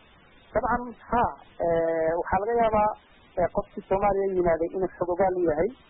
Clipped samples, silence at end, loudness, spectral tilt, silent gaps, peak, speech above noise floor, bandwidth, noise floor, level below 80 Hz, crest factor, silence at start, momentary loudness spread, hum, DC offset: under 0.1%; 0.15 s; -26 LUFS; -11 dB/octave; none; -12 dBFS; 30 dB; 3.9 kHz; -55 dBFS; -46 dBFS; 14 dB; 0.55 s; 6 LU; none; under 0.1%